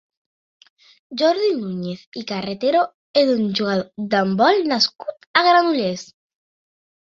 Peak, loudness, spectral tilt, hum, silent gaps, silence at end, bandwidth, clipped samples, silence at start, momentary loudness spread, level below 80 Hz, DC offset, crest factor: 0 dBFS; -19 LUFS; -5 dB/octave; none; 2.07-2.12 s, 2.94-3.14 s, 5.27-5.34 s; 1 s; 7.6 kHz; under 0.1%; 1.1 s; 13 LU; -66 dBFS; under 0.1%; 20 dB